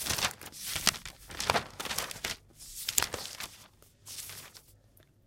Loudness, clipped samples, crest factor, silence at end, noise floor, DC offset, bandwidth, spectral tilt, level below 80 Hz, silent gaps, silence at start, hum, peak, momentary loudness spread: -33 LUFS; under 0.1%; 36 dB; 0.25 s; -62 dBFS; under 0.1%; 17 kHz; -1 dB/octave; -56 dBFS; none; 0 s; none; 0 dBFS; 16 LU